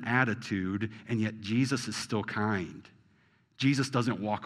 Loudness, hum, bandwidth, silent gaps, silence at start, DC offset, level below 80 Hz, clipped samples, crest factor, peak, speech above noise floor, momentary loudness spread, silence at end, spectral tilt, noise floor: -31 LUFS; none; 13 kHz; none; 0 s; under 0.1%; -70 dBFS; under 0.1%; 20 dB; -10 dBFS; 36 dB; 7 LU; 0 s; -5.5 dB/octave; -67 dBFS